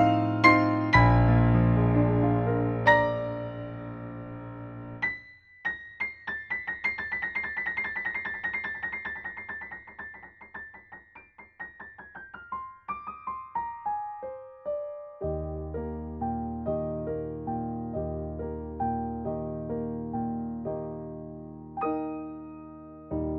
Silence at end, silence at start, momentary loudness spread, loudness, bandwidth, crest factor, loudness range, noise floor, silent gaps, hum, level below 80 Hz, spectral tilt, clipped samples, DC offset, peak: 0 s; 0 s; 20 LU; -29 LUFS; 7 kHz; 24 dB; 14 LU; -52 dBFS; none; none; -44 dBFS; -8.5 dB/octave; under 0.1%; under 0.1%; -6 dBFS